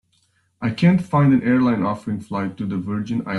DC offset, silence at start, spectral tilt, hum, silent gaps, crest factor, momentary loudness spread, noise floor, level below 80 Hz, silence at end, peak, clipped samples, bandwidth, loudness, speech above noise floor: under 0.1%; 0.6 s; -8.5 dB/octave; none; none; 14 dB; 10 LU; -64 dBFS; -56 dBFS; 0 s; -4 dBFS; under 0.1%; 11 kHz; -20 LUFS; 45 dB